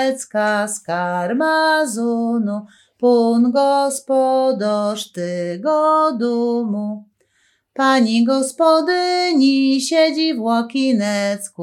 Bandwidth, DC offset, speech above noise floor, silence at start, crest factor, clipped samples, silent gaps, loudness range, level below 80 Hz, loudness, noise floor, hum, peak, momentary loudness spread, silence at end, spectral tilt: 13.5 kHz; under 0.1%; 45 dB; 0 s; 14 dB; under 0.1%; none; 3 LU; -78 dBFS; -17 LUFS; -62 dBFS; none; -2 dBFS; 8 LU; 0 s; -4 dB/octave